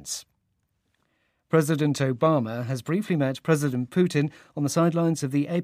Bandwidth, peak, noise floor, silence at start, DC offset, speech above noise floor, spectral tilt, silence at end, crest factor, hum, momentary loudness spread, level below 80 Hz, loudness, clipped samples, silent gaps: 15.5 kHz; -8 dBFS; -74 dBFS; 0 s; under 0.1%; 50 dB; -6.5 dB/octave; 0 s; 18 dB; none; 8 LU; -70 dBFS; -25 LUFS; under 0.1%; none